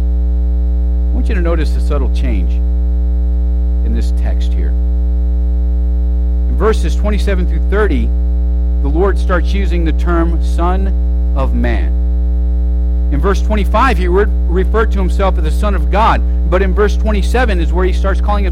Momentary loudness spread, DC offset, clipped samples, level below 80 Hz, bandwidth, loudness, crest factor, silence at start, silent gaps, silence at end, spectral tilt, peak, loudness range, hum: 3 LU; under 0.1%; under 0.1%; -12 dBFS; 7 kHz; -14 LUFS; 10 dB; 0 s; none; 0 s; -7.5 dB/octave; -2 dBFS; 2 LU; 60 Hz at -10 dBFS